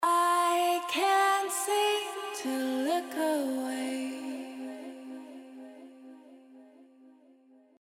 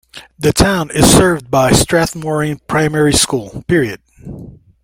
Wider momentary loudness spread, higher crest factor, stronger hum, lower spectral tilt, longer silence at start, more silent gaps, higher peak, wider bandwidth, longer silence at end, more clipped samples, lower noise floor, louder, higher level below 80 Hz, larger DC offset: about the same, 22 LU vs 20 LU; about the same, 16 dB vs 14 dB; neither; second, -0.5 dB/octave vs -4 dB/octave; second, 0 s vs 0.15 s; neither; second, -16 dBFS vs 0 dBFS; about the same, 17 kHz vs 17 kHz; first, 0.7 s vs 0.3 s; neither; first, -60 dBFS vs -34 dBFS; second, -29 LUFS vs -13 LUFS; second, under -90 dBFS vs -32 dBFS; neither